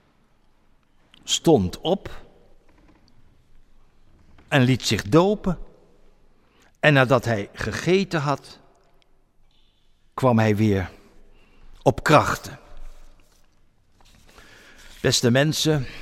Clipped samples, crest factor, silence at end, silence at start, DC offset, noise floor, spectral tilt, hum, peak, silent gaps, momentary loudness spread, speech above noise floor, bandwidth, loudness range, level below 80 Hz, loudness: under 0.1%; 22 dB; 0 s; 1.25 s; under 0.1%; -59 dBFS; -5 dB/octave; none; -4 dBFS; none; 12 LU; 39 dB; 16 kHz; 4 LU; -46 dBFS; -21 LUFS